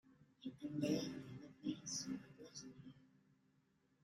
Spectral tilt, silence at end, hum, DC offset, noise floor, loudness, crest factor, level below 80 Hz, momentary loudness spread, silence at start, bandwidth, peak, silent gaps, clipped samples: -4.5 dB/octave; 1 s; none; under 0.1%; -78 dBFS; -47 LUFS; 22 dB; -80 dBFS; 16 LU; 0.05 s; 13.5 kHz; -28 dBFS; none; under 0.1%